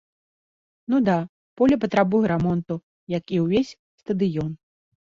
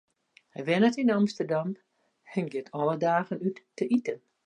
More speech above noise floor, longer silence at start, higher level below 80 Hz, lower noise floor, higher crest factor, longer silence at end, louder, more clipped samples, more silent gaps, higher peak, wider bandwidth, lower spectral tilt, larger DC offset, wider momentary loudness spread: first, over 69 dB vs 26 dB; first, 0.9 s vs 0.55 s; first, -52 dBFS vs -78 dBFS; first, under -90 dBFS vs -54 dBFS; about the same, 18 dB vs 18 dB; first, 0.5 s vs 0.3 s; first, -23 LUFS vs -28 LUFS; neither; first, 1.29-1.56 s, 2.83-3.07 s, 3.79-3.98 s vs none; first, -6 dBFS vs -10 dBFS; second, 7.4 kHz vs 9.8 kHz; about the same, -8 dB/octave vs -7 dB/octave; neither; about the same, 13 LU vs 13 LU